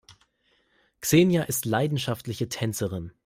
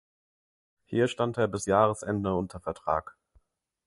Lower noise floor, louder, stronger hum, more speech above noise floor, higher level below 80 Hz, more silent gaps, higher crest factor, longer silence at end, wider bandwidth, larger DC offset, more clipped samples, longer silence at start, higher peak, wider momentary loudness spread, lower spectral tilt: about the same, -68 dBFS vs -67 dBFS; first, -25 LUFS vs -28 LUFS; neither; first, 43 dB vs 39 dB; about the same, -58 dBFS vs -54 dBFS; neither; about the same, 20 dB vs 22 dB; second, 0.15 s vs 0.75 s; first, 16 kHz vs 11.5 kHz; neither; neither; second, 0.1 s vs 0.9 s; about the same, -6 dBFS vs -8 dBFS; first, 11 LU vs 8 LU; about the same, -5 dB/octave vs -6 dB/octave